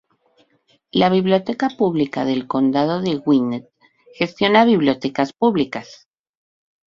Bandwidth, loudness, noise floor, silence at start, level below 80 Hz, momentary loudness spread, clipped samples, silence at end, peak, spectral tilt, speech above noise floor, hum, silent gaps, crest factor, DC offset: 7.4 kHz; -18 LUFS; -61 dBFS; 0.95 s; -60 dBFS; 10 LU; under 0.1%; 0.9 s; -2 dBFS; -7 dB/octave; 43 dB; none; none; 18 dB; under 0.1%